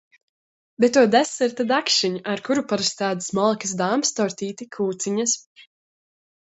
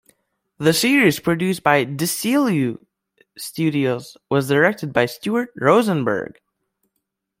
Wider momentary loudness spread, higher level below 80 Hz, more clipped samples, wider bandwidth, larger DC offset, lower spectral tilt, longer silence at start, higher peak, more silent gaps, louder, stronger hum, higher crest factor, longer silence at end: about the same, 9 LU vs 10 LU; second, -68 dBFS vs -60 dBFS; neither; second, 8.2 kHz vs 16.5 kHz; neither; second, -3 dB/octave vs -5 dB/octave; first, 0.8 s vs 0.6 s; about the same, -4 dBFS vs -2 dBFS; first, 5.46-5.55 s vs none; second, -22 LUFS vs -19 LUFS; neither; about the same, 20 dB vs 18 dB; second, 0.95 s vs 1.1 s